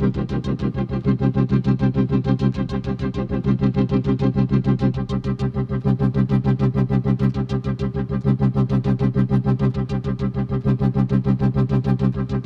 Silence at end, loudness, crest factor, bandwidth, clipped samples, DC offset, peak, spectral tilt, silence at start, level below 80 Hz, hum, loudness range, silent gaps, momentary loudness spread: 0 s; -21 LUFS; 12 dB; 6 kHz; under 0.1%; under 0.1%; -6 dBFS; -10 dB/octave; 0 s; -34 dBFS; none; 1 LU; none; 5 LU